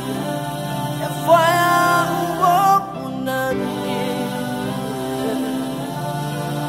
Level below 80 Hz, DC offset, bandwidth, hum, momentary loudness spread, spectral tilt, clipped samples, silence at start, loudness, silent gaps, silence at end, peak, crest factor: -52 dBFS; under 0.1%; 16.5 kHz; none; 10 LU; -5 dB/octave; under 0.1%; 0 s; -20 LUFS; none; 0 s; -2 dBFS; 18 dB